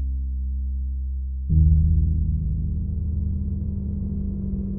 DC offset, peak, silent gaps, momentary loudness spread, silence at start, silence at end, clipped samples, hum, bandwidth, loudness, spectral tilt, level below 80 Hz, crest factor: under 0.1%; -6 dBFS; none; 10 LU; 0 s; 0 s; under 0.1%; none; 0.7 kHz; -25 LUFS; -16.5 dB/octave; -24 dBFS; 16 dB